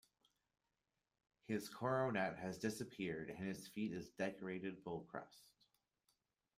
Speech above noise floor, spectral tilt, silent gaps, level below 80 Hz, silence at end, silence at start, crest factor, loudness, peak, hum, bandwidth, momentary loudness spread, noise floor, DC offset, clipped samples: over 45 dB; -5.5 dB/octave; none; -78 dBFS; 1.1 s; 1.5 s; 20 dB; -45 LUFS; -26 dBFS; none; 15.5 kHz; 9 LU; under -90 dBFS; under 0.1%; under 0.1%